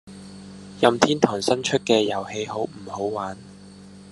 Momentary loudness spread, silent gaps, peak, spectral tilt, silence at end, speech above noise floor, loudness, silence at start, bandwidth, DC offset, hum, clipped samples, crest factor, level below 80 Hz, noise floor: 22 LU; none; 0 dBFS; -4 dB/octave; 0 s; 22 dB; -23 LUFS; 0.05 s; 12 kHz; under 0.1%; none; under 0.1%; 24 dB; -62 dBFS; -44 dBFS